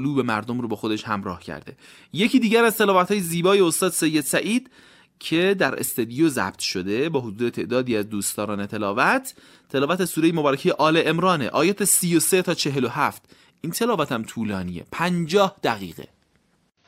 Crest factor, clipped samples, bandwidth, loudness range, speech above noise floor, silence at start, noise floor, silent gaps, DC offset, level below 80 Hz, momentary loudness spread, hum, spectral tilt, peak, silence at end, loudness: 18 dB; under 0.1%; 16 kHz; 4 LU; 43 dB; 0 s; -65 dBFS; none; under 0.1%; -62 dBFS; 10 LU; none; -4 dB/octave; -4 dBFS; 0.85 s; -22 LUFS